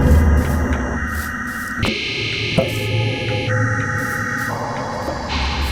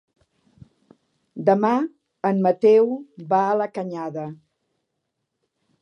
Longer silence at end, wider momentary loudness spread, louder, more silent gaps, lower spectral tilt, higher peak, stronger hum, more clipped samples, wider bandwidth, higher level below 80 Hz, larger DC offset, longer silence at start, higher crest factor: second, 0 s vs 1.45 s; second, 7 LU vs 16 LU; about the same, -20 LUFS vs -21 LUFS; neither; second, -5.5 dB/octave vs -8.5 dB/octave; about the same, -2 dBFS vs -4 dBFS; neither; neither; first, 17 kHz vs 6.6 kHz; first, -26 dBFS vs -74 dBFS; neither; second, 0 s vs 1.35 s; about the same, 16 dB vs 20 dB